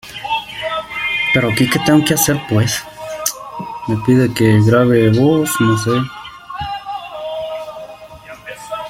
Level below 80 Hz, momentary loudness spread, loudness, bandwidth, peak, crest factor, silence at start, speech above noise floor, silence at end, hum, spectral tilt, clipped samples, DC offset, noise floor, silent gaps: -46 dBFS; 19 LU; -15 LUFS; 16.5 kHz; 0 dBFS; 16 dB; 0.05 s; 23 dB; 0 s; none; -5 dB/octave; under 0.1%; under 0.1%; -36 dBFS; none